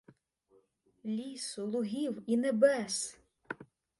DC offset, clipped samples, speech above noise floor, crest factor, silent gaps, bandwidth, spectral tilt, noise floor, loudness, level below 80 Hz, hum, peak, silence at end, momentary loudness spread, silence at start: under 0.1%; under 0.1%; 38 dB; 22 dB; none; 11.5 kHz; -4 dB/octave; -70 dBFS; -33 LUFS; -78 dBFS; none; -14 dBFS; 0.35 s; 18 LU; 1.05 s